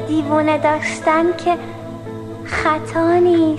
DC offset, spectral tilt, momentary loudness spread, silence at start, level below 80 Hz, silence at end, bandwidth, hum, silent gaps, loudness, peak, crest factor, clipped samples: under 0.1%; -6 dB/octave; 16 LU; 0 s; -46 dBFS; 0 s; 11 kHz; 50 Hz at -45 dBFS; none; -17 LUFS; -2 dBFS; 14 dB; under 0.1%